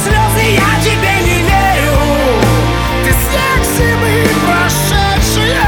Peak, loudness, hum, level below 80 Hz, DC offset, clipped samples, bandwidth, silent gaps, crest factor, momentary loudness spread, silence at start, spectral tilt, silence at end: 0 dBFS; -11 LUFS; none; -18 dBFS; under 0.1%; under 0.1%; 20 kHz; none; 10 dB; 2 LU; 0 s; -4.5 dB/octave; 0 s